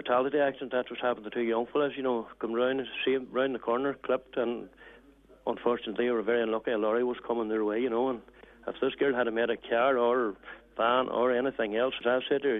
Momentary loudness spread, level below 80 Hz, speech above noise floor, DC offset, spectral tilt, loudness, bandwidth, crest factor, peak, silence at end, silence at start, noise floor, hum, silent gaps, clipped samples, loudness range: 7 LU; -66 dBFS; 28 dB; under 0.1%; -7.5 dB/octave; -29 LUFS; 3.9 kHz; 16 dB; -12 dBFS; 0 s; 0 s; -57 dBFS; none; none; under 0.1%; 3 LU